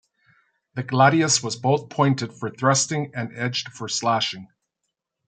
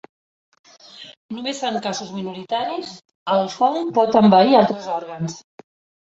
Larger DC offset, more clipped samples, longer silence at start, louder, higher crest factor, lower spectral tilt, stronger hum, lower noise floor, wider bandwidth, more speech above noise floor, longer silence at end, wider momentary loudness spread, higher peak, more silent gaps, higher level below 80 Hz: neither; neither; second, 0.75 s vs 0.95 s; second, -22 LUFS vs -19 LUFS; about the same, 22 dB vs 18 dB; second, -4 dB/octave vs -5.5 dB/octave; neither; first, -80 dBFS vs -43 dBFS; first, 9.4 kHz vs 8 kHz; first, 58 dB vs 24 dB; about the same, 0.8 s vs 0.7 s; second, 13 LU vs 22 LU; about the same, -2 dBFS vs -2 dBFS; second, none vs 1.17-1.29 s, 3.15-3.26 s; about the same, -68 dBFS vs -64 dBFS